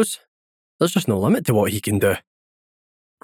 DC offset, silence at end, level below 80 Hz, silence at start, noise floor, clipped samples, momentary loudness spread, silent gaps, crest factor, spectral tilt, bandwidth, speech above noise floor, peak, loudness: under 0.1%; 1.05 s; -60 dBFS; 0 s; under -90 dBFS; under 0.1%; 6 LU; 0.28-0.79 s; 18 dB; -5.5 dB/octave; 19.5 kHz; over 71 dB; -4 dBFS; -20 LUFS